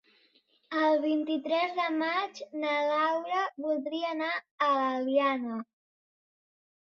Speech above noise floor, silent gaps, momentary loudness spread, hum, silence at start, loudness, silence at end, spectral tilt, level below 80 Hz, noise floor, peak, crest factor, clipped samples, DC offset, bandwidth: 38 dB; 4.51-4.58 s; 8 LU; none; 0.7 s; -29 LUFS; 1.25 s; -4 dB/octave; -82 dBFS; -68 dBFS; -14 dBFS; 16 dB; under 0.1%; under 0.1%; 7 kHz